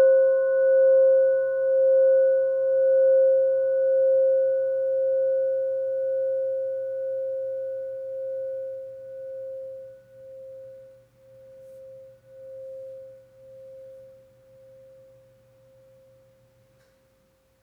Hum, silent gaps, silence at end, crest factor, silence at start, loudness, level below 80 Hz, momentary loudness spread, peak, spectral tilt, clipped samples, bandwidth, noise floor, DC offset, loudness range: none; none; 3.6 s; 12 dB; 0 s; -22 LUFS; -74 dBFS; 24 LU; -12 dBFS; -6 dB/octave; under 0.1%; 1.6 kHz; -64 dBFS; under 0.1%; 25 LU